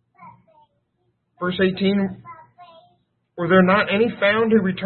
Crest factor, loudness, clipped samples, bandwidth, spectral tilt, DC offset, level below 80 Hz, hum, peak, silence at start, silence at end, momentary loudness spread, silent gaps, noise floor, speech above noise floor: 20 dB; -19 LUFS; under 0.1%; 4.4 kHz; -11 dB/octave; under 0.1%; -58 dBFS; none; -2 dBFS; 0.2 s; 0 s; 13 LU; none; -70 dBFS; 52 dB